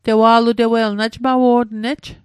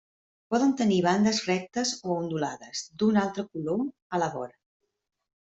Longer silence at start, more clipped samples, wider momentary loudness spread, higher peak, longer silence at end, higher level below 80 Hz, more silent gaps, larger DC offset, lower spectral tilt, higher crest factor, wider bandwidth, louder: second, 0.05 s vs 0.5 s; neither; about the same, 10 LU vs 10 LU; first, 0 dBFS vs -12 dBFS; second, 0.1 s vs 1.05 s; first, -50 dBFS vs -68 dBFS; second, none vs 4.02-4.10 s; neither; about the same, -6 dB/octave vs -5 dB/octave; about the same, 14 dB vs 18 dB; first, 11.5 kHz vs 8.2 kHz; first, -15 LUFS vs -27 LUFS